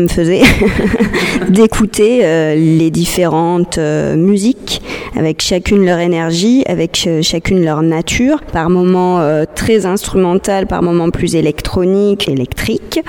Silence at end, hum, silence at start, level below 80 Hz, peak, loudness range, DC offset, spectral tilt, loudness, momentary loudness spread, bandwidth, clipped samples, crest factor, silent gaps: 0 s; none; 0 s; -28 dBFS; 0 dBFS; 2 LU; under 0.1%; -5.5 dB/octave; -12 LUFS; 5 LU; 18 kHz; under 0.1%; 12 dB; none